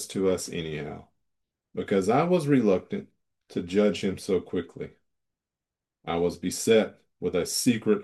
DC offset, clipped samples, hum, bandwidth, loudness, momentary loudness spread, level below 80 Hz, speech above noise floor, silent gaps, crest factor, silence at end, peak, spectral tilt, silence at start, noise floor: under 0.1%; under 0.1%; none; 12.5 kHz; -27 LUFS; 16 LU; -64 dBFS; 63 dB; none; 18 dB; 0 s; -8 dBFS; -5 dB/octave; 0 s; -89 dBFS